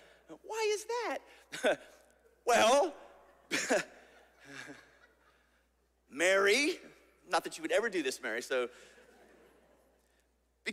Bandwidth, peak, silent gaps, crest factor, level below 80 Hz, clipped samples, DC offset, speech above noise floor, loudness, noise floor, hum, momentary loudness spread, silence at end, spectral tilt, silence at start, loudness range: 16 kHz; -14 dBFS; none; 20 dB; -74 dBFS; under 0.1%; under 0.1%; 41 dB; -32 LUFS; -74 dBFS; none; 21 LU; 0 s; -1.5 dB/octave; 0.3 s; 6 LU